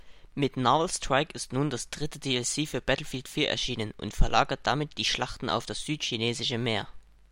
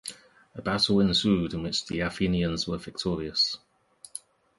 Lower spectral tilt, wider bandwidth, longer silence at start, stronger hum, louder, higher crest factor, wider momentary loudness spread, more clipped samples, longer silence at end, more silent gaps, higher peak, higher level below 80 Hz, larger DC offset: second, -3.5 dB/octave vs -5 dB/octave; first, 16.5 kHz vs 11.5 kHz; about the same, 0.05 s vs 0.05 s; neither; second, -29 LUFS vs -26 LUFS; about the same, 20 dB vs 18 dB; second, 8 LU vs 19 LU; neither; about the same, 0.3 s vs 0.4 s; neither; about the same, -8 dBFS vs -10 dBFS; first, -38 dBFS vs -48 dBFS; neither